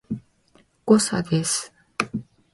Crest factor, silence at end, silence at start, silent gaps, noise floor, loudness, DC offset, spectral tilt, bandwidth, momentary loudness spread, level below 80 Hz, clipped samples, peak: 22 dB; 0.3 s; 0.1 s; none; -60 dBFS; -22 LUFS; under 0.1%; -4.5 dB/octave; 11.5 kHz; 16 LU; -58 dBFS; under 0.1%; -2 dBFS